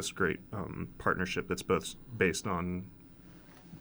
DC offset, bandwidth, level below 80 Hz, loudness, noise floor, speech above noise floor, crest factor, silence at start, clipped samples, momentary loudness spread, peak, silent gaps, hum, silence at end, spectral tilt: under 0.1%; over 20 kHz; -58 dBFS; -34 LUFS; -54 dBFS; 20 dB; 22 dB; 0 s; under 0.1%; 22 LU; -14 dBFS; none; none; 0 s; -4.5 dB/octave